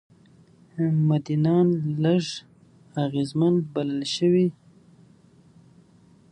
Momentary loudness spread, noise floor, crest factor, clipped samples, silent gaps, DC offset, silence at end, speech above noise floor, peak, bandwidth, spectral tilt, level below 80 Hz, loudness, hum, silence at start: 9 LU; -55 dBFS; 16 dB; under 0.1%; none; under 0.1%; 1.8 s; 33 dB; -10 dBFS; 10.5 kHz; -7.5 dB/octave; -68 dBFS; -24 LUFS; none; 0.75 s